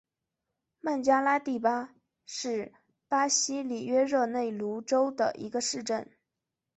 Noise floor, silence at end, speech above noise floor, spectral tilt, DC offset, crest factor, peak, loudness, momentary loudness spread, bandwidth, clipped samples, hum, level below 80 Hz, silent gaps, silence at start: -87 dBFS; 0.7 s; 58 dB; -2.5 dB/octave; under 0.1%; 18 dB; -12 dBFS; -29 LUFS; 11 LU; 8.2 kHz; under 0.1%; none; -76 dBFS; none; 0.85 s